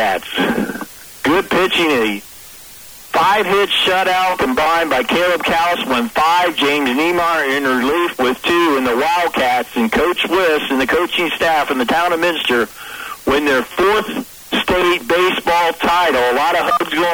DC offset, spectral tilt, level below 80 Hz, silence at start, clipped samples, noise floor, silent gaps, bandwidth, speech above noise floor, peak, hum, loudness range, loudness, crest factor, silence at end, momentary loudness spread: under 0.1%; -3.5 dB/octave; -44 dBFS; 0 s; under 0.1%; -37 dBFS; none; over 20 kHz; 22 dB; -4 dBFS; none; 2 LU; -15 LUFS; 10 dB; 0 s; 7 LU